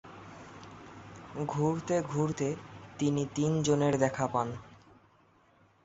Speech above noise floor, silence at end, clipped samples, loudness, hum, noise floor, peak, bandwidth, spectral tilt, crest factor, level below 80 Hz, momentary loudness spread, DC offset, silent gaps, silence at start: 34 dB; 1.1 s; under 0.1%; -31 LUFS; none; -64 dBFS; -12 dBFS; 8 kHz; -6 dB/octave; 22 dB; -64 dBFS; 21 LU; under 0.1%; none; 0.05 s